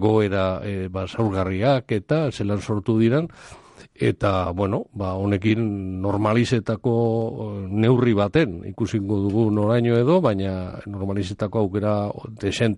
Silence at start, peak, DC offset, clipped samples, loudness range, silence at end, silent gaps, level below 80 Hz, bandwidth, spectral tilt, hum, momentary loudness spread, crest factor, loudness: 0 s; -6 dBFS; under 0.1%; under 0.1%; 3 LU; 0 s; none; -50 dBFS; 11 kHz; -7.5 dB/octave; none; 9 LU; 16 dB; -22 LUFS